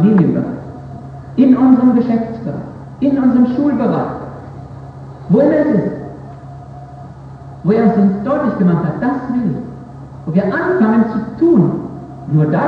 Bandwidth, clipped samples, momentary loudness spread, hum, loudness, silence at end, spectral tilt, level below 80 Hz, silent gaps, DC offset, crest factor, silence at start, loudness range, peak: 5.2 kHz; under 0.1%; 21 LU; none; -14 LUFS; 0 s; -10.5 dB/octave; -44 dBFS; none; under 0.1%; 14 dB; 0 s; 4 LU; 0 dBFS